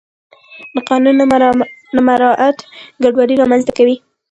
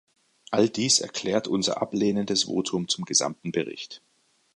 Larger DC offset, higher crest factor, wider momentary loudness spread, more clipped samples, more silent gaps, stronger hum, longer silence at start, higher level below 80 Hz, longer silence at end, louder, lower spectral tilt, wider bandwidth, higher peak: neither; second, 12 dB vs 20 dB; about the same, 10 LU vs 10 LU; neither; neither; neither; about the same, 0.55 s vs 0.5 s; first, -52 dBFS vs -66 dBFS; second, 0.35 s vs 0.6 s; first, -12 LUFS vs -25 LUFS; first, -5.5 dB/octave vs -3 dB/octave; second, 8.8 kHz vs 11.5 kHz; first, 0 dBFS vs -8 dBFS